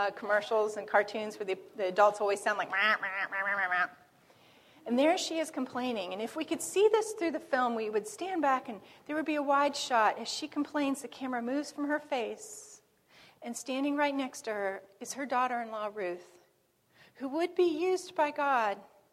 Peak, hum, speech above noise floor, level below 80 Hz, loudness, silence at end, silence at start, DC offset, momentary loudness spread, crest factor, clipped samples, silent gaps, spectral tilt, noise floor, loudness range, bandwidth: -12 dBFS; none; 39 dB; -82 dBFS; -31 LUFS; 0.25 s; 0 s; under 0.1%; 11 LU; 20 dB; under 0.1%; none; -2.5 dB/octave; -71 dBFS; 6 LU; 16 kHz